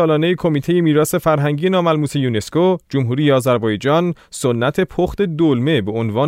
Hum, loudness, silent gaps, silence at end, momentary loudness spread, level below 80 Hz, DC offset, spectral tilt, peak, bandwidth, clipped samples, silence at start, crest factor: none; -17 LUFS; none; 0 s; 4 LU; -46 dBFS; under 0.1%; -6.5 dB/octave; -2 dBFS; 16 kHz; under 0.1%; 0 s; 14 dB